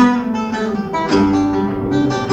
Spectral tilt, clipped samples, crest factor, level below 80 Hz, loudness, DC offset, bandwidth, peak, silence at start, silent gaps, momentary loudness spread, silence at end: -6.5 dB/octave; under 0.1%; 14 dB; -40 dBFS; -17 LUFS; under 0.1%; 8.4 kHz; -2 dBFS; 0 s; none; 6 LU; 0 s